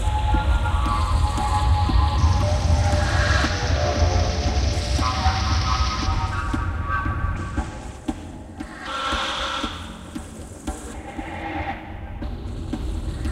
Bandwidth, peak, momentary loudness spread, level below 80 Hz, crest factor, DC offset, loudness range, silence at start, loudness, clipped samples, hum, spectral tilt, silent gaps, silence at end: 11.5 kHz; -6 dBFS; 14 LU; -26 dBFS; 16 dB; under 0.1%; 9 LU; 0 s; -23 LUFS; under 0.1%; none; -5 dB/octave; none; 0 s